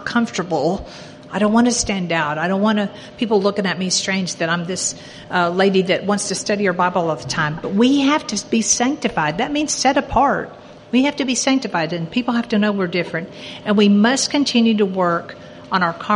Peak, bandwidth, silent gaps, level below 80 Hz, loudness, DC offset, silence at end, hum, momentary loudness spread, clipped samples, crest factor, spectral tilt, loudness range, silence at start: -2 dBFS; 11.5 kHz; none; -48 dBFS; -18 LUFS; under 0.1%; 0 s; none; 8 LU; under 0.1%; 16 dB; -4 dB/octave; 2 LU; 0 s